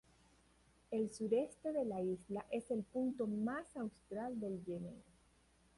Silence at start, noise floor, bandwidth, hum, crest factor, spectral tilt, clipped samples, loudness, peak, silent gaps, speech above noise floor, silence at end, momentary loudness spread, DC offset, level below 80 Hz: 0.9 s; -71 dBFS; 11.5 kHz; none; 18 dB; -7 dB/octave; under 0.1%; -42 LUFS; -24 dBFS; none; 30 dB; 0.75 s; 9 LU; under 0.1%; -72 dBFS